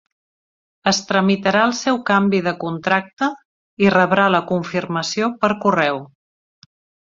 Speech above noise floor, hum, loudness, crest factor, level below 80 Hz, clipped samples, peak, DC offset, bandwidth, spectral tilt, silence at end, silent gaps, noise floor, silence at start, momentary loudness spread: over 72 dB; none; -18 LUFS; 18 dB; -60 dBFS; under 0.1%; 0 dBFS; under 0.1%; 7.6 kHz; -5 dB/octave; 1 s; 3.13-3.17 s, 3.45-3.77 s; under -90 dBFS; 0.85 s; 8 LU